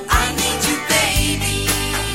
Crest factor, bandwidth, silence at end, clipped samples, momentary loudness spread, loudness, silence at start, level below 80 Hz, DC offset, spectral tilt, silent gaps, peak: 16 dB; 16.5 kHz; 0 s; under 0.1%; 3 LU; -17 LUFS; 0 s; -28 dBFS; 0.3%; -2.5 dB/octave; none; -2 dBFS